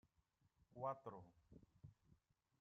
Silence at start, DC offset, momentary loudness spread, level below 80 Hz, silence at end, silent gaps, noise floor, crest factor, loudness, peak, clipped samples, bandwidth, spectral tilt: 0.7 s; under 0.1%; 18 LU; -82 dBFS; 0.45 s; none; -83 dBFS; 22 dB; -52 LUFS; -34 dBFS; under 0.1%; 6.2 kHz; -7.5 dB/octave